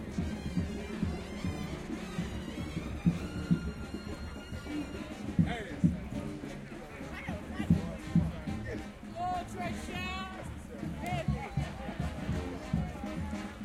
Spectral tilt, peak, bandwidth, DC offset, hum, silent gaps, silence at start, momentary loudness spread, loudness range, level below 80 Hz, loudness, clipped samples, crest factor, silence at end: -7 dB/octave; -14 dBFS; 14 kHz; under 0.1%; none; none; 0 s; 10 LU; 3 LU; -46 dBFS; -36 LUFS; under 0.1%; 22 dB; 0 s